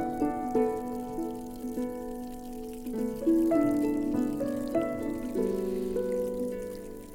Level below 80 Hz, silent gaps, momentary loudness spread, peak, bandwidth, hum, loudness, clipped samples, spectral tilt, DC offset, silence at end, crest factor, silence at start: -50 dBFS; none; 13 LU; -14 dBFS; 17 kHz; none; -31 LUFS; under 0.1%; -7 dB/octave; under 0.1%; 0 s; 16 dB; 0 s